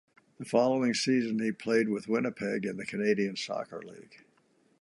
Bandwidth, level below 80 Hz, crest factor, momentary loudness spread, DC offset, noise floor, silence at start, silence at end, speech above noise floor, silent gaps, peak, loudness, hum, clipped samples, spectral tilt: 11.5 kHz; -76 dBFS; 20 dB; 12 LU; under 0.1%; -68 dBFS; 0.4 s; 0.65 s; 38 dB; none; -12 dBFS; -30 LUFS; none; under 0.1%; -5 dB/octave